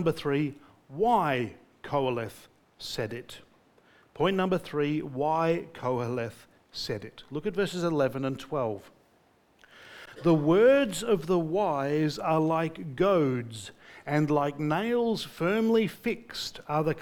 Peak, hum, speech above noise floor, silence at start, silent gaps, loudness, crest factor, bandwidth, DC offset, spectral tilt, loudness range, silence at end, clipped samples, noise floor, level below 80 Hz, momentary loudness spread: -12 dBFS; none; 37 dB; 0 s; none; -28 LUFS; 18 dB; 19 kHz; under 0.1%; -6.5 dB/octave; 7 LU; 0 s; under 0.1%; -64 dBFS; -60 dBFS; 16 LU